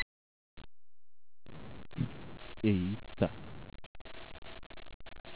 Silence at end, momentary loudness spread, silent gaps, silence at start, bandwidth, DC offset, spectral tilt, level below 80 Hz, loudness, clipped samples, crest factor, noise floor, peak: 0 s; 22 LU; 0.02-0.57 s, 3.86-3.95 s, 4.01-4.05 s, 4.38-4.42 s, 4.66-4.70 s, 4.94-5.00 s, 5.20-5.24 s; 0 s; 4 kHz; 0.4%; -6.5 dB/octave; -56 dBFS; -37 LUFS; under 0.1%; 26 dB; under -90 dBFS; -14 dBFS